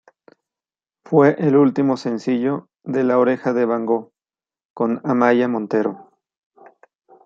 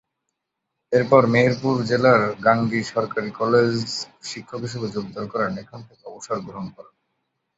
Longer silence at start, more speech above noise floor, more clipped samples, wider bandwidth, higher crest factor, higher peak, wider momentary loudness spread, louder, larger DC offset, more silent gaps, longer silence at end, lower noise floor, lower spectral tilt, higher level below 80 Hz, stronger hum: first, 1.1 s vs 0.9 s; first, over 72 dB vs 59 dB; neither; about the same, 7.4 kHz vs 8 kHz; about the same, 18 dB vs 20 dB; about the same, -2 dBFS vs -2 dBFS; second, 9 LU vs 18 LU; about the same, -19 LUFS vs -21 LUFS; neither; first, 4.65-4.76 s vs none; first, 1.25 s vs 0.75 s; first, under -90 dBFS vs -80 dBFS; first, -8 dB/octave vs -6 dB/octave; second, -72 dBFS vs -58 dBFS; neither